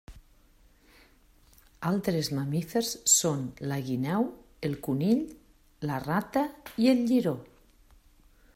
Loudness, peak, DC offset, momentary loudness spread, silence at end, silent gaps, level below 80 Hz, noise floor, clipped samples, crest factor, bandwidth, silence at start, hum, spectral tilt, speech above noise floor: -28 LUFS; -10 dBFS; under 0.1%; 12 LU; 1.1 s; none; -60 dBFS; -60 dBFS; under 0.1%; 20 dB; 16 kHz; 0.1 s; none; -4.5 dB/octave; 32 dB